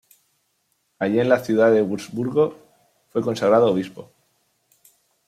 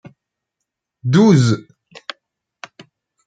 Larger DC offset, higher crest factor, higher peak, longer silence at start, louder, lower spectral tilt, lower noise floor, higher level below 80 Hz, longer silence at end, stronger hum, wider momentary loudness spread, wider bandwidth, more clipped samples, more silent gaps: neither; about the same, 20 dB vs 18 dB; about the same, -2 dBFS vs -2 dBFS; about the same, 1 s vs 1.05 s; second, -20 LUFS vs -15 LUFS; about the same, -6.5 dB/octave vs -7 dB/octave; second, -70 dBFS vs -80 dBFS; second, -66 dBFS vs -58 dBFS; second, 1.25 s vs 1.65 s; neither; second, 10 LU vs 25 LU; first, 14.5 kHz vs 9.2 kHz; neither; neither